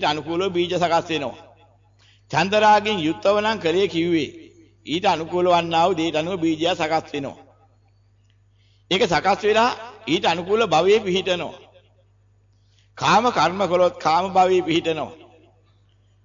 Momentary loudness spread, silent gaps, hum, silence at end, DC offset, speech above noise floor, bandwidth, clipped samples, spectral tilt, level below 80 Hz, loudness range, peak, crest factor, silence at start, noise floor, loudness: 9 LU; none; 50 Hz at -50 dBFS; 1.1 s; under 0.1%; 38 dB; 7.6 kHz; under 0.1%; -4.5 dB/octave; -56 dBFS; 3 LU; -6 dBFS; 14 dB; 0 s; -58 dBFS; -20 LUFS